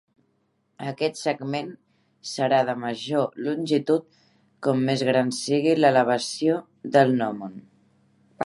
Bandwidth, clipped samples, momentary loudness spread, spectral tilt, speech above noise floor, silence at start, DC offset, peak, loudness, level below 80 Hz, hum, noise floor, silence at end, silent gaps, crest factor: 11.5 kHz; under 0.1%; 14 LU; -5.5 dB/octave; 47 dB; 0.8 s; under 0.1%; -4 dBFS; -24 LUFS; -74 dBFS; none; -70 dBFS; 0 s; none; 20 dB